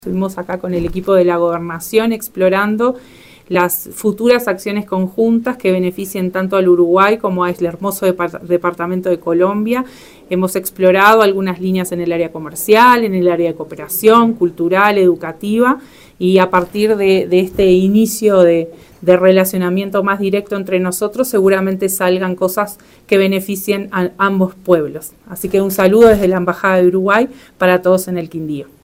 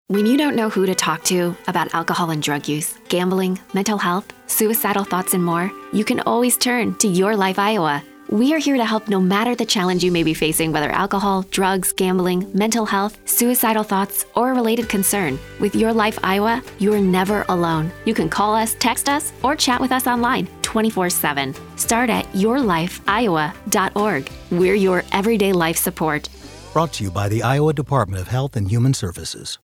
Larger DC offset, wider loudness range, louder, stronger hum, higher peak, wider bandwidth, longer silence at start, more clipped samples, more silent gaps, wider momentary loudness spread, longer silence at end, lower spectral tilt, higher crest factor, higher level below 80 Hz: neither; about the same, 4 LU vs 2 LU; first, -14 LUFS vs -19 LUFS; neither; about the same, 0 dBFS vs -2 dBFS; about the same, 16.5 kHz vs 17.5 kHz; about the same, 0.05 s vs 0.1 s; neither; neither; first, 10 LU vs 5 LU; about the same, 0.2 s vs 0.1 s; about the same, -5.5 dB/octave vs -4.5 dB/octave; about the same, 14 dB vs 18 dB; about the same, -46 dBFS vs -46 dBFS